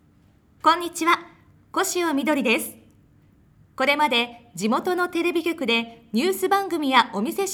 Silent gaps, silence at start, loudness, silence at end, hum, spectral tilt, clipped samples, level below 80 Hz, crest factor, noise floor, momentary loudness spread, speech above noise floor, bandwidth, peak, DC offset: none; 0.65 s; -22 LUFS; 0 s; none; -3 dB/octave; under 0.1%; -66 dBFS; 22 dB; -57 dBFS; 6 LU; 35 dB; over 20 kHz; -2 dBFS; under 0.1%